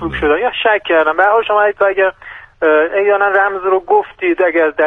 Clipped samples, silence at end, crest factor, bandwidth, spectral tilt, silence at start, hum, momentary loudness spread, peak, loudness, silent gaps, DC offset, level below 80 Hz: under 0.1%; 0 s; 12 dB; 3.9 kHz; -6.5 dB/octave; 0 s; none; 5 LU; 0 dBFS; -13 LUFS; none; under 0.1%; -42 dBFS